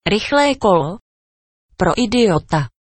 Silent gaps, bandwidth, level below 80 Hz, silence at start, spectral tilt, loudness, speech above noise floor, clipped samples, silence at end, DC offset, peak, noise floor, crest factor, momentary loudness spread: 1.01-1.69 s; 8.8 kHz; -40 dBFS; 0.05 s; -5.5 dB/octave; -16 LUFS; over 74 dB; under 0.1%; 0.15 s; under 0.1%; 0 dBFS; under -90 dBFS; 18 dB; 7 LU